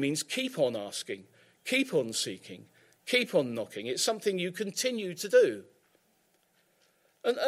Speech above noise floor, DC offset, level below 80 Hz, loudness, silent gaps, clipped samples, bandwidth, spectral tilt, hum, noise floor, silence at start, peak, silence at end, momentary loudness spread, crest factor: 40 dB; under 0.1%; -84 dBFS; -30 LUFS; none; under 0.1%; 16 kHz; -3 dB/octave; none; -70 dBFS; 0 s; -10 dBFS; 0 s; 17 LU; 20 dB